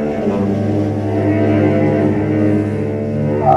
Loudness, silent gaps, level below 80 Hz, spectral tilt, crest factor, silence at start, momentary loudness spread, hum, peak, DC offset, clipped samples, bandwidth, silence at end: -16 LUFS; none; -42 dBFS; -9.5 dB/octave; 14 dB; 0 s; 5 LU; none; 0 dBFS; under 0.1%; under 0.1%; 7.8 kHz; 0 s